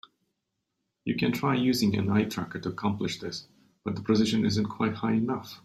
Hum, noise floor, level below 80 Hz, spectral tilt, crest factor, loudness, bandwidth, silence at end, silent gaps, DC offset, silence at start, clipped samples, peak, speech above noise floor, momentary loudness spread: none; -82 dBFS; -62 dBFS; -6 dB/octave; 18 dB; -28 LUFS; 14 kHz; 0.05 s; none; under 0.1%; 1.05 s; under 0.1%; -12 dBFS; 54 dB; 11 LU